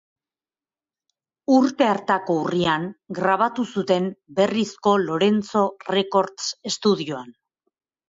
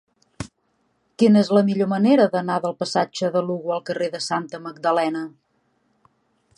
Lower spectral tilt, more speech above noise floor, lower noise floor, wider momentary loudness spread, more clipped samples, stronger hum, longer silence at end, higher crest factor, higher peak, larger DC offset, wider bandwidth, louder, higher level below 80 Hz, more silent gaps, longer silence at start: about the same, -5 dB/octave vs -6 dB/octave; first, over 69 dB vs 48 dB; first, under -90 dBFS vs -68 dBFS; second, 7 LU vs 18 LU; neither; neither; second, 0.8 s vs 1.3 s; about the same, 18 dB vs 18 dB; about the same, -6 dBFS vs -4 dBFS; neither; second, 7.8 kHz vs 11 kHz; about the same, -22 LUFS vs -21 LUFS; about the same, -64 dBFS vs -60 dBFS; neither; first, 1.5 s vs 0.4 s